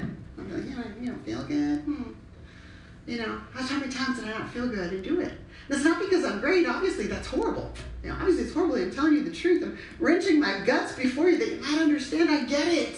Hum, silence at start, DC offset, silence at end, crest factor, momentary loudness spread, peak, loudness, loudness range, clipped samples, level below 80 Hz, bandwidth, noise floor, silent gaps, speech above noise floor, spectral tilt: none; 0 s; under 0.1%; 0 s; 16 dB; 12 LU; -10 dBFS; -27 LUFS; 8 LU; under 0.1%; -48 dBFS; 11 kHz; -47 dBFS; none; 21 dB; -5 dB/octave